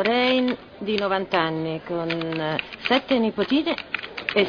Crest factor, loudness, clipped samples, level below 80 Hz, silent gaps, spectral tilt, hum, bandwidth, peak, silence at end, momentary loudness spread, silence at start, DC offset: 18 dB; -24 LUFS; under 0.1%; -58 dBFS; none; -6.5 dB/octave; none; 5.4 kHz; -6 dBFS; 0 s; 8 LU; 0 s; under 0.1%